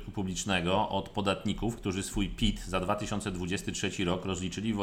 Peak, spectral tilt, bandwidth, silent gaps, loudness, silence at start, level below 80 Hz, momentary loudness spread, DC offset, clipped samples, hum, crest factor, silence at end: -14 dBFS; -4.5 dB/octave; 16.5 kHz; none; -32 LUFS; 0 s; -44 dBFS; 5 LU; under 0.1%; under 0.1%; none; 18 dB; 0 s